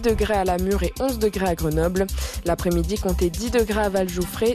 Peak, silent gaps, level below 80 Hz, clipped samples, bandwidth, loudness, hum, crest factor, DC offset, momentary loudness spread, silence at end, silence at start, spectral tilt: -10 dBFS; none; -30 dBFS; under 0.1%; 14 kHz; -23 LUFS; none; 12 dB; under 0.1%; 3 LU; 0 s; 0 s; -5.5 dB/octave